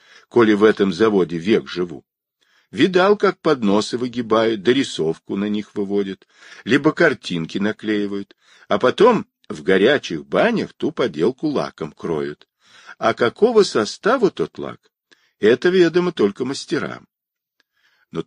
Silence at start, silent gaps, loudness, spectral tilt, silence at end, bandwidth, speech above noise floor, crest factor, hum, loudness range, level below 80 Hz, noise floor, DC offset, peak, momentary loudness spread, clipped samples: 0.35 s; none; -19 LUFS; -5.5 dB/octave; 0.05 s; 10.5 kHz; 66 dB; 18 dB; none; 3 LU; -60 dBFS; -84 dBFS; under 0.1%; -2 dBFS; 13 LU; under 0.1%